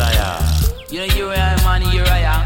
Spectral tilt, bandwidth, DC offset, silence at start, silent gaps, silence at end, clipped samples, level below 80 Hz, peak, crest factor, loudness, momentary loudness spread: -4.5 dB/octave; 17.5 kHz; under 0.1%; 0 s; none; 0 s; under 0.1%; -18 dBFS; -2 dBFS; 12 dB; -17 LUFS; 4 LU